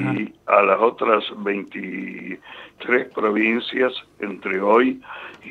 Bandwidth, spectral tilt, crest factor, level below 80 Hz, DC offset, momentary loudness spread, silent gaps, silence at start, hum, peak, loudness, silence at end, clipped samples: 7 kHz; -7 dB/octave; 20 dB; -68 dBFS; under 0.1%; 17 LU; none; 0 s; none; -2 dBFS; -20 LUFS; 0 s; under 0.1%